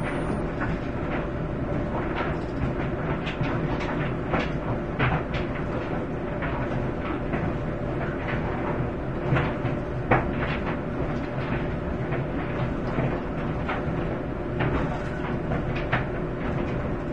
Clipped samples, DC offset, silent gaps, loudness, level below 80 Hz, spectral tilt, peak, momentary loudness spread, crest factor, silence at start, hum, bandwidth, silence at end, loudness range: under 0.1%; 0.6%; none; -28 LUFS; -36 dBFS; -8.5 dB/octave; -4 dBFS; 4 LU; 22 dB; 0 s; none; 10 kHz; 0 s; 2 LU